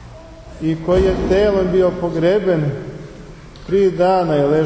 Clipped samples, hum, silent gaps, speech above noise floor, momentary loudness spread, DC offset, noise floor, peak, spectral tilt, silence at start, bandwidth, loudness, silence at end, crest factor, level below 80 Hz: under 0.1%; none; none; 21 dB; 18 LU; under 0.1%; -37 dBFS; -4 dBFS; -8 dB/octave; 0 s; 8 kHz; -16 LUFS; 0 s; 14 dB; -34 dBFS